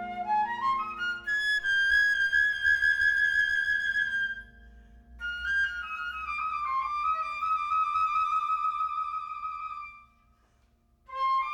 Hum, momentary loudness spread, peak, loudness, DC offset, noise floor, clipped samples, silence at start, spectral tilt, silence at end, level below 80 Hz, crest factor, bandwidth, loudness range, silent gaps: none; 13 LU; -14 dBFS; -27 LUFS; under 0.1%; -66 dBFS; under 0.1%; 0 s; -1 dB/octave; 0 s; -56 dBFS; 14 dB; 12.5 kHz; 7 LU; none